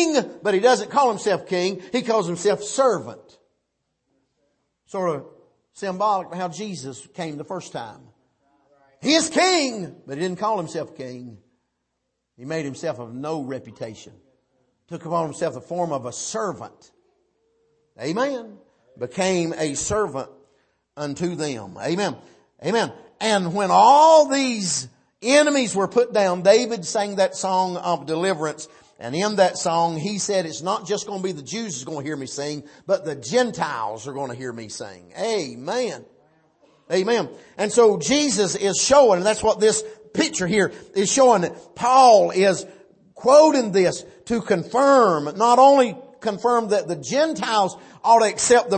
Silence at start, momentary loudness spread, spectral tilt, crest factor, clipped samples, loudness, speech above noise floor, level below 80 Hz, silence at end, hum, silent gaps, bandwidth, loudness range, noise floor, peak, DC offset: 0 s; 18 LU; -3.5 dB/octave; 18 dB; under 0.1%; -20 LUFS; 56 dB; -60 dBFS; 0 s; none; none; 8.8 kHz; 12 LU; -77 dBFS; -2 dBFS; under 0.1%